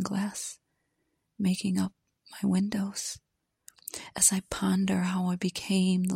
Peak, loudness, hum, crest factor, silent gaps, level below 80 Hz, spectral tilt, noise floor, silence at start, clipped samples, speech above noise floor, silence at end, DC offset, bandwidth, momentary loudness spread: -8 dBFS; -29 LUFS; none; 22 dB; none; -60 dBFS; -4.5 dB/octave; -78 dBFS; 0 s; under 0.1%; 49 dB; 0 s; under 0.1%; 16 kHz; 16 LU